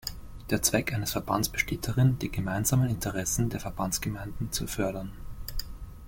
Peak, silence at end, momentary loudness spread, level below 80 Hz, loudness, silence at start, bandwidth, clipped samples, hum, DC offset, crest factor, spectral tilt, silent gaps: -8 dBFS; 0 s; 13 LU; -42 dBFS; -29 LUFS; 0.05 s; 17 kHz; under 0.1%; none; under 0.1%; 22 dB; -4.5 dB/octave; none